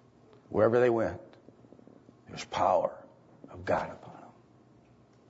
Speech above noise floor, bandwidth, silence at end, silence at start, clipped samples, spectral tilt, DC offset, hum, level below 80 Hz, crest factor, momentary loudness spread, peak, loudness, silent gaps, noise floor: 32 dB; 8 kHz; 1.1 s; 0.5 s; under 0.1%; -6.5 dB/octave; under 0.1%; none; -66 dBFS; 20 dB; 25 LU; -12 dBFS; -29 LUFS; none; -60 dBFS